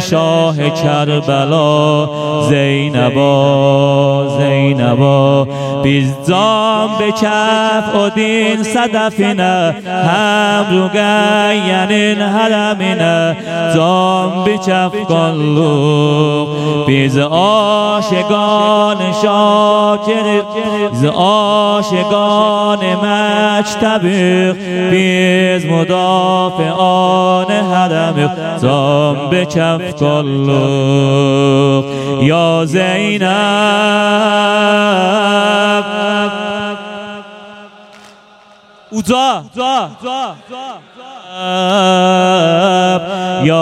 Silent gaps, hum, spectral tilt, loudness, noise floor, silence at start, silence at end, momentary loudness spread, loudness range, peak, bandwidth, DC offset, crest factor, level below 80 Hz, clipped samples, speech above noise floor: none; none; -5.5 dB/octave; -12 LUFS; -43 dBFS; 0 s; 0 s; 5 LU; 4 LU; 0 dBFS; 13 kHz; under 0.1%; 12 dB; -54 dBFS; under 0.1%; 31 dB